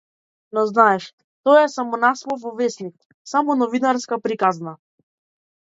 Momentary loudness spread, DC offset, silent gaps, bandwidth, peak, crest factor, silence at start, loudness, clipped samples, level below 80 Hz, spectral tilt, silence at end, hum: 15 LU; under 0.1%; 1.13-1.18 s, 1.24-1.44 s, 3.05-3.25 s; 8 kHz; -2 dBFS; 20 dB; 0.55 s; -19 LUFS; under 0.1%; -76 dBFS; -4.5 dB/octave; 0.9 s; none